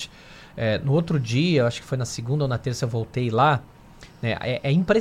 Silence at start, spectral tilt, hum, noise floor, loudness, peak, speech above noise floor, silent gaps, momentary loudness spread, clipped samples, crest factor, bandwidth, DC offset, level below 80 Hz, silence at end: 0 s; -6.5 dB/octave; none; -47 dBFS; -24 LUFS; -6 dBFS; 24 dB; none; 8 LU; under 0.1%; 18 dB; 13 kHz; under 0.1%; -50 dBFS; 0 s